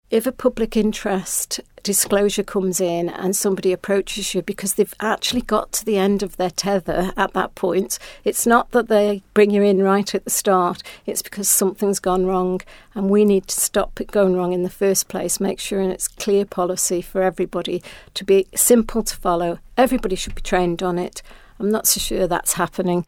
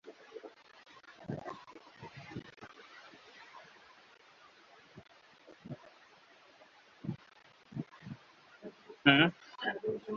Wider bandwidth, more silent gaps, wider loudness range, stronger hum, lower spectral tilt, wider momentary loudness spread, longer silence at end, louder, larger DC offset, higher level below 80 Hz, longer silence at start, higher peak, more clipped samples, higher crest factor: first, 18 kHz vs 7 kHz; neither; second, 3 LU vs 22 LU; neither; first, -4 dB/octave vs -2.5 dB/octave; second, 8 LU vs 28 LU; about the same, 0.05 s vs 0 s; first, -20 LUFS vs -33 LUFS; neither; first, -40 dBFS vs -74 dBFS; about the same, 0.1 s vs 0.05 s; first, -2 dBFS vs -6 dBFS; neither; second, 18 dB vs 32 dB